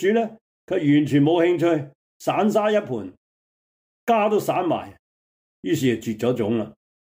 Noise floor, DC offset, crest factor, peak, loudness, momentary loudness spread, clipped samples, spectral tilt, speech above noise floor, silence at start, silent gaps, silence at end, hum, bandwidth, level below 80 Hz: under -90 dBFS; under 0.1%; 14 dB; -8 dBFS; -22 LUFS; 14 LU; under 0.1%; -6.5 dB/octave; over 69 dB; 0 s; 0.41-0.68 s, 1.95-2.20 s, 3.17-4.07 s, 4.99-5.63 s; 0.3 s; none; 16 kHz; -66 dBFS